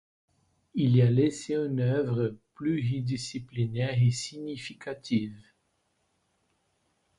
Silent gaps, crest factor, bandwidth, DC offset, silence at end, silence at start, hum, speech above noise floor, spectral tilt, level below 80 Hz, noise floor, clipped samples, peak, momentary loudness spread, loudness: none; 18 dB; 11 kHz; under 0.1%; 1.75 s; 0.75 s; none; 47 dB; -7 dB/octave; -62 dBFS; -74 dBFS; under 0.1%; -12 dBFS; 14 LU; -29 LUFS